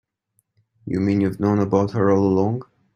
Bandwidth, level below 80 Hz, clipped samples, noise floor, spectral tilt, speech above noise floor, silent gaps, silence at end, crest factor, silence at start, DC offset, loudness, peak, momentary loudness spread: 7 kHz; -56 dBFS; under 0.1%; -70 dBFS; -9 dB/octave; 51 dB; none; 0.35 s; 18 dB; 0.85 s; under 0.1%; -20 LUFS; -4 dBFS; 10 LU